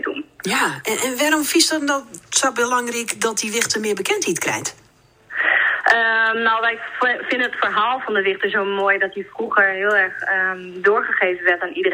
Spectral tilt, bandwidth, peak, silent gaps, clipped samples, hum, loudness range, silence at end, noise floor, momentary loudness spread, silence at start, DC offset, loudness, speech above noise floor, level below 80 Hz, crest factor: -1.5 dB/octave; 16 kHz; 0 dBFS; none; under 0.1%; none; 2 LU; 0 s; -53 dBFS; 7 LU; 0 s; under 0.1%; -18 LUFS; 34 dB; -66 dBFS; 18 dB